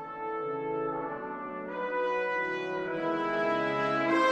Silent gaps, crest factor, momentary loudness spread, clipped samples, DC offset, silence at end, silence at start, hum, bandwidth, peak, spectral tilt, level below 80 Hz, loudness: none; 16 dB; 8 LU; under 0.1%; under 0.1%; 0 s; 0 s; none; 8.8 kHz; -16 dBFS; -5.5 dB/octave; -68 dBFS; -31 LUFS